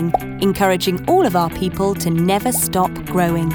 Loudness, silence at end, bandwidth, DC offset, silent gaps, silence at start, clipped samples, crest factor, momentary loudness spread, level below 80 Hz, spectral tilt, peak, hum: -17 LUFS; 0 s; over 20 kHz; under 0.1%; none; 0 s; under 0.1%; 14 dB; 4 LU; -40 dBFS; -5 dB/octave; -2 dBFS; none